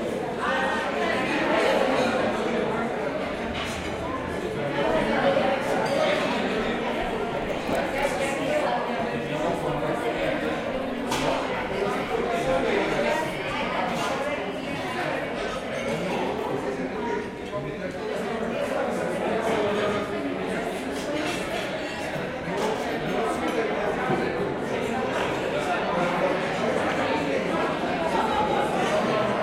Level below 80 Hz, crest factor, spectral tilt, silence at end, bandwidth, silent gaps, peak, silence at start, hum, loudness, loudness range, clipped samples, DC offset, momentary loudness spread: -50 dBFS; 18 dB; -5 dB/octave; 0 s; 16.5 kHz; none; -8 dBFS; 0 s; none; -26 LUFS; 4 LU; under 0.1%; under 0.1%; 6 LU